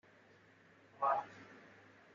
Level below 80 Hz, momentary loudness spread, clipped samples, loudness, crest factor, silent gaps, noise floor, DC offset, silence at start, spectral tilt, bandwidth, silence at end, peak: under -90 dBFS; 24 LU; under 0.1%; -38 LUFS; 22 dB; none; -65 dBFS; under 0.1%; 1 s; -3 dB/octave; 7.4 kHz; 0.6 s; -22 dBFS